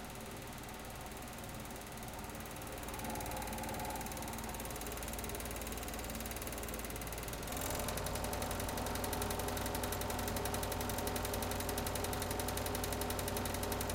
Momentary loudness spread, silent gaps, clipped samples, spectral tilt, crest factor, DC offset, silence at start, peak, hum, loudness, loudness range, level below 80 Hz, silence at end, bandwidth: 8 LU; none; under 0.1%; -3.5 dB/octave; 18 dB; under 0.1%; 0 s; -22 dBFS; none; -40 LUFS; 5 LU; -50 dBFS; 0 s; 17 kHz